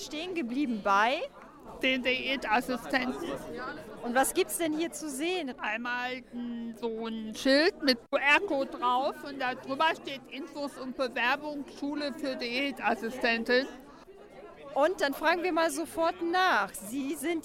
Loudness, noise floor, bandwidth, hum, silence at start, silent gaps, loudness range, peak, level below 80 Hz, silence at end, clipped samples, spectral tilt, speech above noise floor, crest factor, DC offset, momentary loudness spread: -30 LUFS; -51 dBFS; 16 kHz; none; 0 s; none; 4 LU; -10 dBFS; -62 dBFS; 0 s; under 0.1%; -2.5 dB/octave; 21 dB; 20 dB; under 0.1%; 13 LU